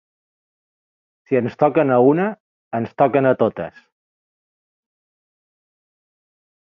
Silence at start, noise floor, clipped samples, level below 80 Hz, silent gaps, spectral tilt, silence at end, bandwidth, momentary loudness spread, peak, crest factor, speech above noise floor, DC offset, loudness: 1.3 s; under -90 dBFS; under 0.1%; -64 dBFS; 2.40-2.71 s; -10 dB/octave; 3 s; 6 kHz; 13 LU; -2 dBFS; 20 dB; over 73 dB; under 0.1%; -18 LUFS